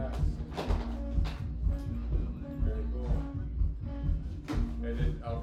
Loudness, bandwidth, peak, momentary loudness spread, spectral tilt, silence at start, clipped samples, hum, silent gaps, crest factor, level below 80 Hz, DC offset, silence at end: -35 LUFS; 7.8 kHz; -18 dBFS; 3 LU; -8 dB/octave; 0 s; under 0.1%; none; none; 14 dB; -34 dBFS; under 0.1%; 0 s